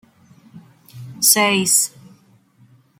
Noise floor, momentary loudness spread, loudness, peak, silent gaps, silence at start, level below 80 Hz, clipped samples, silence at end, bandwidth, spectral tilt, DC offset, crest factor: -53 dBFS; 11 LU; -14 LUFS; 0 dBFS; none; 0.55 s; -68 dBFS; under 0.1%; 1.1 s; 16.5 kHz; -1.5 dB/octave; under 0.1%; 22 dB